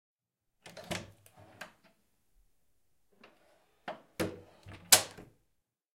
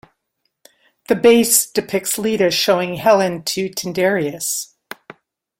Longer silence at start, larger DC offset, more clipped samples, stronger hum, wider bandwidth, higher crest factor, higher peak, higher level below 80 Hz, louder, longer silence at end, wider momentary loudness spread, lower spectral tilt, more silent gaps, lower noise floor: second, 0.75 s vs 1.1 s; neither; neither; neither; about the same, 16.5 kHz vs 16.5 kHz; first, 36 dB vs 18 dB; second, -4 dBFS vs 0 dBFS; second, -70 dBFS vs -60 dBFS; second, -29 LUFS vs -17 LUFS; second, 0.75 s vs 0.95 s; first, 29 LU vs 12 LU; second, -0.5 dB/octave vs -3 dB/octave; neither; first, -83 dBFS vs -72 dBFS